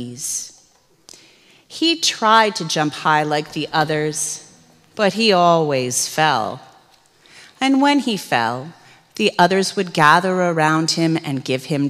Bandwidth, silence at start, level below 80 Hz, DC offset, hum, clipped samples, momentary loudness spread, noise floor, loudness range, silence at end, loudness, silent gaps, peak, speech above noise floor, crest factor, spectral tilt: 15.5 kHz; 0 s; -66 dBFS; under 0.1%; none; under 0.1%; 11 LU; -55 dBFS; 2 LU; 0 s; -17 LUFS; none; 0 dBFS; 37 dB; 18 dB; -3.5 dB/octave